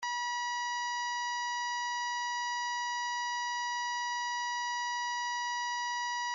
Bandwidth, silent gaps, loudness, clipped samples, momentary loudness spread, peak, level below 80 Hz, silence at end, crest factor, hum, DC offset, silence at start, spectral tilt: 7.4 kHz; none; -34 LUFS; under 0.1%; 0 LU; -28 dBFS; -88 dBFS; 0 s; 8 dB; none; under 0.1%; 0 s; 5 dB/octave